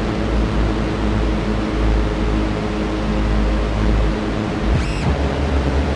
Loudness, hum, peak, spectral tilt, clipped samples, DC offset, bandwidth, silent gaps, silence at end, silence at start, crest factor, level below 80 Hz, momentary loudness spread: -20 LUFS; none; -6 dBFS; -7 dB/octave; under 0.1%; under 0.1%; 10 kHz; none; 0 s; 0 s; 12 dB; -20 dBFS; 2 LU